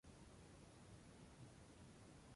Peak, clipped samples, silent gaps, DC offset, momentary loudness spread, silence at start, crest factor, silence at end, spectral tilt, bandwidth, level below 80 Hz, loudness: -48 dBFS; under 0.1%; none; under 0.1%; 1 LU; 0.05 s; 14 dB; 0 s; -5 dB/octave; 11.5 kHz; -72 dBFS; -64 LUFS